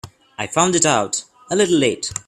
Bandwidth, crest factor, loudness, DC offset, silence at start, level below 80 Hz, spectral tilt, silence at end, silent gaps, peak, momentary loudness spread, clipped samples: 13.5 kHz; 18 dB; -18 LUFS; under 0.1%; 0.05 s; -54 dBFS; -3 dB/octave; 0.05 s; none; 0 dBFS; 12 LU; under 0.1%